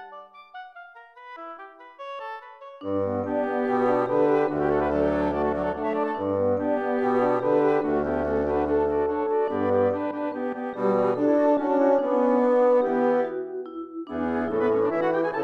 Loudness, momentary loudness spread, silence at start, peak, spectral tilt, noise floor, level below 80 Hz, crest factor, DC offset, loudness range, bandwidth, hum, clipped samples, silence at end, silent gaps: -24 LUFS; 18 LU; 0 s; -10 dBFS; -8.5 dB/octave; -46 dBFS; -50 dBFS; 14 dB; under 0.1%; 5 LU; 6.2 kHz; none; under 0.1%; 0 s; none